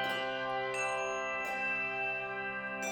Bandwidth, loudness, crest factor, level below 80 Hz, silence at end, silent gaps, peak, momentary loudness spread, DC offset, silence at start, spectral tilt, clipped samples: over 20 kHz; -34 LUFS; 12 dB; -70 dBFS; 0 s; none; -24 dBFS; 4 LU; under 0.1%; 0 s; -2.5 dB/octave; under 0.1%